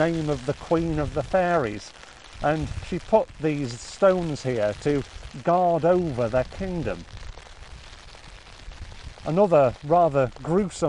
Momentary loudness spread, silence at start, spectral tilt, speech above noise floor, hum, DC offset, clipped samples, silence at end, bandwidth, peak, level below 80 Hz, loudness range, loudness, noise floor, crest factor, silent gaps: 24 LU; 0 s; -6.5 dB/octave; 21 dB; none; 0.1%; under 0.1%; 0 s; 11.5 kHz; -6 dBFS; -42 dBFS; 4 LU; -24 LUFS; -44 dBFS; 18 dB; none